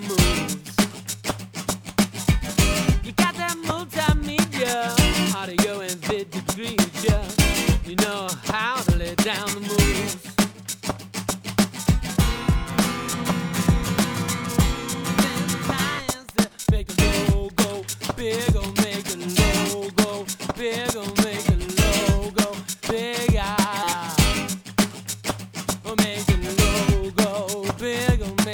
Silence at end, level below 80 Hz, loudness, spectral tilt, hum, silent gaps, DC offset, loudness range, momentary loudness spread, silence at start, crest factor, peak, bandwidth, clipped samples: 0 s; -30 dBFS; -23 LUFS; -4.5 dB/octave; none; none; under 0.1%; 2 LU; 8 LU; 0 s; 22 dB; -2 dBFS; over 20 kHz; under 0.1%